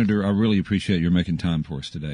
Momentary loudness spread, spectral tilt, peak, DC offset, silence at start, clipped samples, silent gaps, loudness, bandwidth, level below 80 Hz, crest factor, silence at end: 8 LU; -7.5 dB/octave; -8 dBFS; under 0.1%; 0 s; under 0.1%; none; -22 LUFS; 10 kHz; -46 dBFS; 14 dB; 0 s